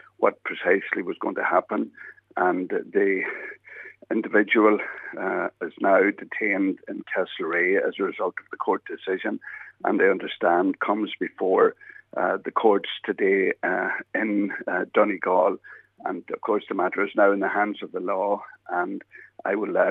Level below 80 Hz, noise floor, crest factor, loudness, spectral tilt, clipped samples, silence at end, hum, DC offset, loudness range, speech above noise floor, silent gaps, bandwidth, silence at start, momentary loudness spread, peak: -80 dBFS; -44 dBFS; 20 dB; -24 LUFS; -8 dB/octave; under 0.1%; 0 s; none; under 0.1%; 2 LU; 20 dB; none; 4 kHz; 0.2 s; 11 LU; -4 dBFS